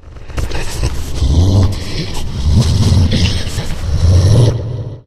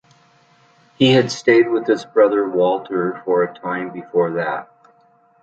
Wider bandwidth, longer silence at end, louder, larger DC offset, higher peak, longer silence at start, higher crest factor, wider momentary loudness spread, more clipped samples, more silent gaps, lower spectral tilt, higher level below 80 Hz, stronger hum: first, 13.5 kHz vs 8.4 kHz; second, 0.05 s vs 0.8 s; first, -14 LUFS vs -18 LUFS; neither; about the same, 0 dBFS vs -2 dBFS; second, 0.05 s vs 1 s; about the same, 12 dB vs 16 dB; about the same, 11 LU vs 10 LU; neither; neither; about the same, -6 dB/octave vs -5.5 dB/octave; first, -18 dBFS vs -64 dBFS; neither